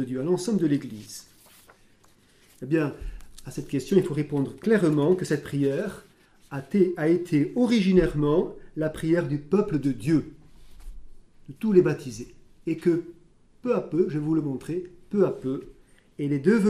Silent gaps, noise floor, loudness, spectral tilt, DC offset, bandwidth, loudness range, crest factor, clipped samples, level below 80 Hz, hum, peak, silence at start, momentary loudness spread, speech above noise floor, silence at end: none; -58 dBFS; -25 LUFS; -7.5 dB/octave; under 0.1%; 13.5 kHz; 5 LU; 20 dB; under 0.1%; -48 dBFS; none; -6 dBFS; 0 s; 17 LU; 34 dB; 0 s